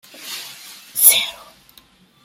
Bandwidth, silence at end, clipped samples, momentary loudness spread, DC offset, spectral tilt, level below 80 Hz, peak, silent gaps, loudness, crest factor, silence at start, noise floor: 17 kHz; 0.9 s; under 0.1%; 23 LU; under 0.1%; 3 dB/octave; -68 dBFS; 0 dBFS; none; -13 LUFS; 22 dB; 0.2 s; -51 dBFS